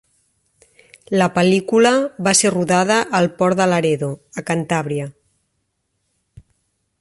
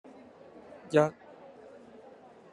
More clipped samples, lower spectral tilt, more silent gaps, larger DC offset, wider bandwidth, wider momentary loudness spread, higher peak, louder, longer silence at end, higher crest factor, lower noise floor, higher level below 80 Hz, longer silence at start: neither; second, -4.5 dB/octave vs -6.5 dB/octave; neither; neither; about the same, 11.5 kHz vs 11 kHz; second, 11 LU vs 26 LU; first, -2 dBFS vs -10 dBFS; first, -17 LUFS vs -28 LUFS; first, 1.9 s vs 1.4 s; second, 16 dB vs 24 dB; first, -71 dBFS vs -54 dBFS; first, -58 dBFS vs -76 dBFS; first, 1.1 s vs 0.9 s